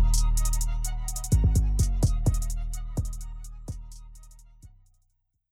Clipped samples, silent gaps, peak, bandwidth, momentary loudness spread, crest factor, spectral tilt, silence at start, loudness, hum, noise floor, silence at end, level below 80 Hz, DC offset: under 0.1%; none; -12 dBFS; 15.5 kHz; 18 LU; 14 dB; -5.5 dB/octave; 0 s; -28 LUFS; none; -72 dBFS; 0.85 s; -28 dBFS; under 0.1%